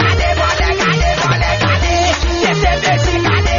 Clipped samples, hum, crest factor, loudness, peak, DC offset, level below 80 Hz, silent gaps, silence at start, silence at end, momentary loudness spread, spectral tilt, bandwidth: under 0.1%; none; 12 dB; -13 LUFS; 0 dBFS; under 0.1%; -20 dBFS; none; 0 s; 0 s; 1 LU; -3.5 dB/octave; 7.4 kHz